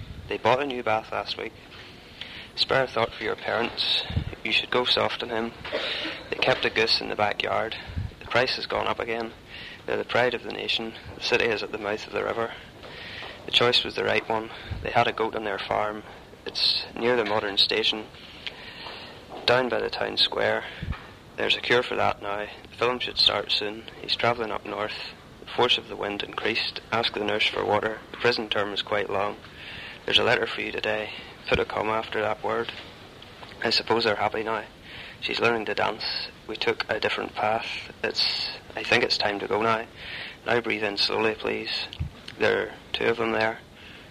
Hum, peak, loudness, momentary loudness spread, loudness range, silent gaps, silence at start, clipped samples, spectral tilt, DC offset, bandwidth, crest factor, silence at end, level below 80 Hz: none; -6 dBFS; -25 LUFS; 16 LU; 3 LU; none; 0 s; under 0.1%; -4 dB/octave; under 0.1%; 15 kHz; 22 dB; 0 s; -50 dBFS